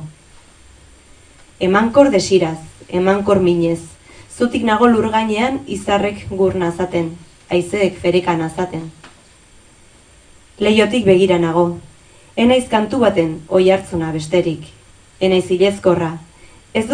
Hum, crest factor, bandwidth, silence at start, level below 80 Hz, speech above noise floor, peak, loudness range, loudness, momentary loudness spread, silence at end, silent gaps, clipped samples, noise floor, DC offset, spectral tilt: none; 16 dB; 10.5 kHz; 0 s; -44 dBFS; 31 dB; 0 dBFS; 5 LU; -16 LUFS; 11 LU; 0 s; none; under 0.1%; -46 dBFS; under 0.1%; -6 dB/octave